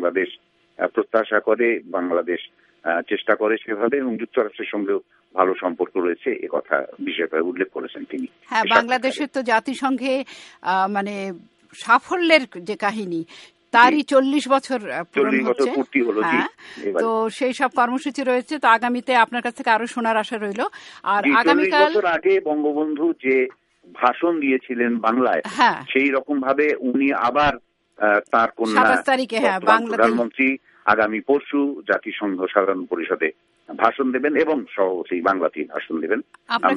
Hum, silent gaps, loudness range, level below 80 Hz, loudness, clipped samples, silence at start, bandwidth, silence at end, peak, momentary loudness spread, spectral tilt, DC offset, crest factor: none; none; 4 LU; -60 dBFS; -20 LUFS; under 0.1%; 0 s; 11.5 kHz; 0 s; 0 dBFS; 10 LU; -4.5 dB/octave; under 0.1%; 20 dB